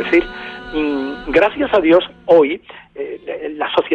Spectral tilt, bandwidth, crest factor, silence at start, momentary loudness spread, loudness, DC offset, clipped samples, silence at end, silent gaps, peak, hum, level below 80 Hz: -6.5 dB/octave; 6.8 kHz; 14 dB; 0 s; 16 LU; -16 LUFS; under 0.1%; under 0.1%; 0 s; none; -2 dBFS; none; -42 dBFS